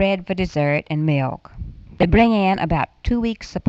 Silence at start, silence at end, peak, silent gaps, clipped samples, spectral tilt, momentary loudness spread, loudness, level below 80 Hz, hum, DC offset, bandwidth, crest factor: 0 s; 0 s; -4 dBFS; none; under 0.1%; -7.5 dB/octave; 17 LU; -20 LUFS; -32 dBFS; none; under 0.1%; 7.8 kHz; 16 dB